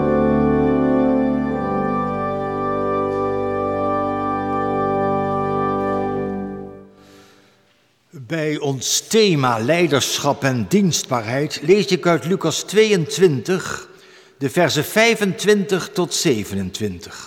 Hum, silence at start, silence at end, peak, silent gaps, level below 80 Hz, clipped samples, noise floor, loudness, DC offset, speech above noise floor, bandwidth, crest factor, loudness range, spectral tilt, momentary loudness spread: none; 0 s; 0 s; -4 dBFS; none; -46 dBFS; under 0.1%; -59 dBFS; -19 LUFS; under 0.1%; 41 dB; 17.5 kHz; 16 dB; 6 LU; -4.5 dB/octave; 8 LU